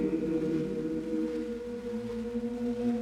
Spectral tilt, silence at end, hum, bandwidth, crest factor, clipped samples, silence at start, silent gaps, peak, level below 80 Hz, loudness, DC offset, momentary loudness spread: -8 dB/octave; 0 s; none; 12 kHz; 14 dB; under 0.1%; 0 s; none; -18 dBFS; -56 dBFS; -33 LUFS; under 0.1%; 6 LU